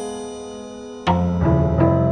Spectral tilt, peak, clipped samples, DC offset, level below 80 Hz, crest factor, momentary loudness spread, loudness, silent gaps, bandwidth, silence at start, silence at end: -8 dB/octave; -4 dBFS; under 0.1%; under 0.1%; -30 dBFS; 16 dB; 17 LU; -19 LUFS; none; 11.5 kHz; 0 s; 0 s